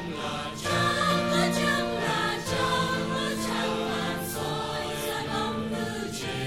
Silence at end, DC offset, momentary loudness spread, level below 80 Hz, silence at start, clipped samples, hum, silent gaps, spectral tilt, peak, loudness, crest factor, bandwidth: 0 s; 0.2%; 7 LU; -52 dBFS; 0 s; under 0.1%; none; none; -4 dB/octave; -12 dBFS; -28 LUFS; 16 dB; 16 kHz